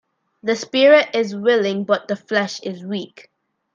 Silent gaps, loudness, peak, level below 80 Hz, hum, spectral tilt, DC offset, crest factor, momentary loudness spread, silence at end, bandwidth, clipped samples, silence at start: none; -18 LUFS; -2 dBFS; -70 dBFS; none; -4.5 dB/octave; under 0.1%; 18 dB; 16 LU; 0.7 s; 7.6 kHz; under 0.1%; 0.45 s